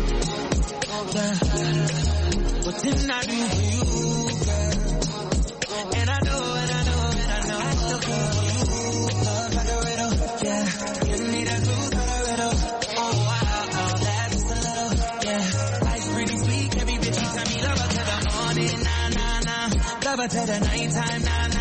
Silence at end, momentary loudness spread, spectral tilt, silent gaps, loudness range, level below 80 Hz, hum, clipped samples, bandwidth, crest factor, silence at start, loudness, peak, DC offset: 0 s; 2 LU; -4 dB/octave; none; 1 LU; -30 dBFS; none; under 0.1%; 8.8 kHz; 18 dB; 0 s; -24 LUFS; -4 dBFS; under 0.1%